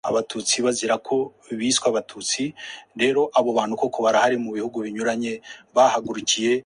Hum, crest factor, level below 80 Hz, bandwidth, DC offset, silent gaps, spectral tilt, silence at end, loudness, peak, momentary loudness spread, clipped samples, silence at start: none; 18 dB; -66 dBFS; 11.5 kHz; under 0.1%; none; -2.5 dB/octave; 0.05 s; -22 LUFS; -4 dBFS; 9 LU; under 0.1%; 0.05 s